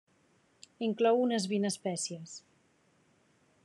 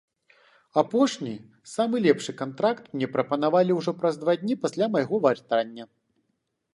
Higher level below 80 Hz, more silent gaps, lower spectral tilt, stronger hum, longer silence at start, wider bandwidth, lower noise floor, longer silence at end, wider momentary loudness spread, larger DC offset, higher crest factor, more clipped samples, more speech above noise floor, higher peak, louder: second, -88 dBFS vs -74 dBFS; neither; second, -4.5 dB/octave vs -6 dB/octave; neither; about the same, 0.8 s vs 0.75 s; about the same, 12 kHz vs 11.5 kHz; second, -69 dBFS vs -76 dBFS; first, 1.25 s vs 0.9 s; first, 18 LU vs 12 LU; neither; about the same, 18 dB vs 20 dB; neither; second, 38 dB vs 52 dB; second, -16 dBFS vs -6 dBFS; second, -31 LUFS vs -25 LUFS